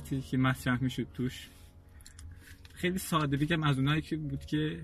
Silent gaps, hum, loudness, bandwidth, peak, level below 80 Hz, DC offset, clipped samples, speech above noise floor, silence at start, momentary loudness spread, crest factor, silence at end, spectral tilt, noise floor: none; none; -32 LUFS; 13.5 kHz; -16 dBFS; -52 dBFS; under 0.1%; under 0.1%; 22 dB; 0 s; 22 LU; 18 dB; 0 s; -6 dB/octave; -53 dBFS